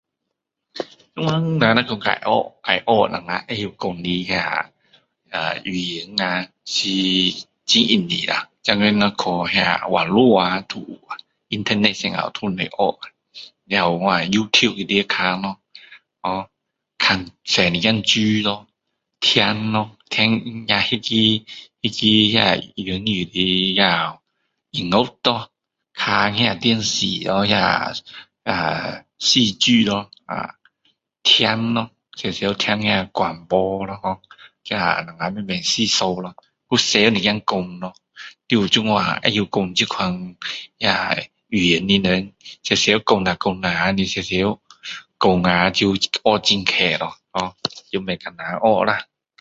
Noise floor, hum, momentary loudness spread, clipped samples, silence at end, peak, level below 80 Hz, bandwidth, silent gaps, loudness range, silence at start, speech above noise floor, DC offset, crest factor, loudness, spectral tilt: -79 dBFS; none; 14 LU; under 0.1%; 0.35 s; 0 dBFS; -52 dBFS; 8 kHz; none; 4 LU; 0.75 s; 60 dB; under 0.1%; 20 dB; -19 LUFS; -4 dB/octave